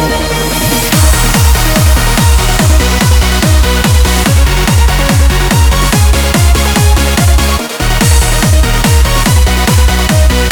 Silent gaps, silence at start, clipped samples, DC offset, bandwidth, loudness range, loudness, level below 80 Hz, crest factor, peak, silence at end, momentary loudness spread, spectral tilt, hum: none; 0 s; 0.3%; under 0.1%; over 20 kHz; 1 LU; -9 LUFS; -10 dBFS; 8 dB; 0 dBFS; 0 s; 2 LU; -4 dB/octave; none